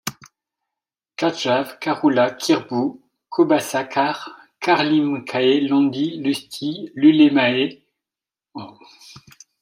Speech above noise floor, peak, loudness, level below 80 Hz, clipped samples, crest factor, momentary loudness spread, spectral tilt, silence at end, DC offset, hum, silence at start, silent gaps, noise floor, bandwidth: 71 dB; -4 dBFS; -19 LUFS; -70 dBFS; under 0.1%; 18 dB; 16 LU; -5 dB/octave; 0.5 s; under 0.1%; none; 0.05 s; none; -89 dBFS; 16 kHz